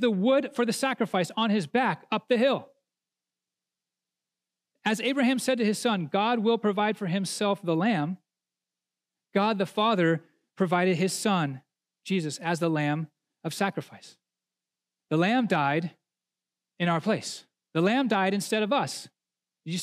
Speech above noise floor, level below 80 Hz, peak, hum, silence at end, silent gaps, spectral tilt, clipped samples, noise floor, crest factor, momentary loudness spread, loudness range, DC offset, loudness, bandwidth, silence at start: 64 dB; -86 dBFS; -10 dBFS; none; 0 s; none; -5 dB/octave; under 0.1%; -90 dBFS; 18 dB; 10 LU; 4 LU; under 0.1%; -27 LUFS; 15.5 kHz; 0 s